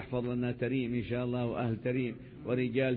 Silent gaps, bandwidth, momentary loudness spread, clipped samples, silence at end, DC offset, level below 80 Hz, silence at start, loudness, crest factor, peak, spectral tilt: none; 4.4 kHz; 3 LU; under 0.1%; 0 s; under 0.1%; -58 dBFS; 0 s; -34 LUFS; 14 dB; -18 dBFS; -7 dB/octave